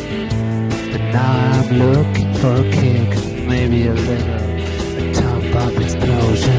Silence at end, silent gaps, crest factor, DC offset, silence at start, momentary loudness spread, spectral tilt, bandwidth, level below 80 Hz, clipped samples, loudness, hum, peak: 0 s; none; 14 dB; under 0.1%; 0 s; 6 LU; -7 dB/octave; 8 kHz; -26 dBFS; under 0.1%; -17 LUFS; none; -2 dBFS